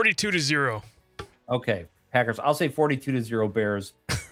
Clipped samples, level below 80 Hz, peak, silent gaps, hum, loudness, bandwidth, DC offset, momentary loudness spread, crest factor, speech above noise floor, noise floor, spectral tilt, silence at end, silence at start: under 0.1%; -56 dBFS; -6 dBFS; none; none; -26 LUFS; 16.5 kHz; under 0.1%; 15 LU; 20 dB; 20 dB; -45 dBFS; -4.5 dB/octave; 0.05 s; 0 s